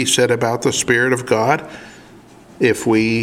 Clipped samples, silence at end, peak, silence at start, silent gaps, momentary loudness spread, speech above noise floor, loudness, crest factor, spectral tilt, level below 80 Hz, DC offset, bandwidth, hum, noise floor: under 0.1%; 0 s; 0 dBFS; 0 s; none; 6 LU; 26 dB; -16 LUFS; 18 dB; -4 dB/octave; -52 dBFS; under 0.1%; 16.5 kHz; none; -43 dBFS